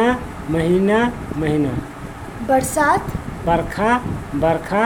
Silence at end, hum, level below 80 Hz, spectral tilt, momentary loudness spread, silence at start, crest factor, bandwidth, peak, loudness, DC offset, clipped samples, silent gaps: 0 s; none; -36 dBFS; -6 dB/octave; 12 LU; 0 s; 16 dB; 18.5 kHz; -4 dBFS; -19 LUFS; under 0.1%; under 0.1%; none